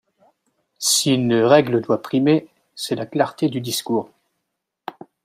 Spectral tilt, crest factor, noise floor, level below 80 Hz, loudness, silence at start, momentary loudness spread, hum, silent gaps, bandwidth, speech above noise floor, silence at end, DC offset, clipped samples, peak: -4 dB/octave; 18 dB; -78 dBFS; -66 dBFS; -19 LUFS; 0.8 s; 22 LU; none; none; 16 kHz; 59 dB; 0.35 s; under 0.1%; under 0.1%; -2 dBFS